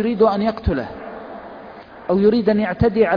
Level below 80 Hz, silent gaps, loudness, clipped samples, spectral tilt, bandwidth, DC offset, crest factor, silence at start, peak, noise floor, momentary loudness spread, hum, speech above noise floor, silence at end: -36 dBFS; none; -18 LUFS; under 0.1%; -9.5 dB/octave; 5.2 kHz; under 0.1%; 16 dB; 0 s; -4 dBFS; -38 dBFS; 20 LU; none; 21 dB; 0 s